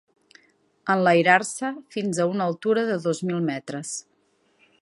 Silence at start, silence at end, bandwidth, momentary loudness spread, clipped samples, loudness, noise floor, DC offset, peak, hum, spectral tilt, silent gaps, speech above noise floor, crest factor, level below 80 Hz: 0.85 s; 0.8 s; 11.5 kHz; 14 LU; under 0.1%; -23 LUFS; -66 dBFS; under 0.1%; -2 dBFS; none; -5 dB/octave; none; 43 dB; 22 dB; -76 dBFS